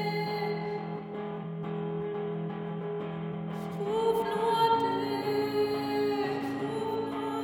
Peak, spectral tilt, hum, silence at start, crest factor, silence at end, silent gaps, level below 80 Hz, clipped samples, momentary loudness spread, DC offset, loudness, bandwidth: -16 dBFS; -6.5 dB/octave; none; 0 s; 16 dB; 0 s; none; -66 dBFS; under 0.1%; 9 LU; under 0.1%; -31 LUFS; 18.5 kHz